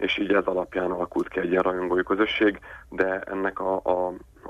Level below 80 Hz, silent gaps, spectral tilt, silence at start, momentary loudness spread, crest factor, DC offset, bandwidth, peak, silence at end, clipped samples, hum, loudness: -52 dBFS; none; -6.5 dB/octave; 0 s; 5 LU; 18 dB; under 0.1%; 7.8 kHz; -8 dBFS; 0 s; under 0.1%; none; -25 LUFS